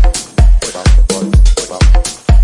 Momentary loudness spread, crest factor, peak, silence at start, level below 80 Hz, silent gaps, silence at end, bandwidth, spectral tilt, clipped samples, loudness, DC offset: 2 LU; 8 dB; 0 dBFS; 0 s; -8 dBFS; none; 0 s; 11.5 kHz; -5 dB/octave; under 0.1%; -12 LUFS; 0.2%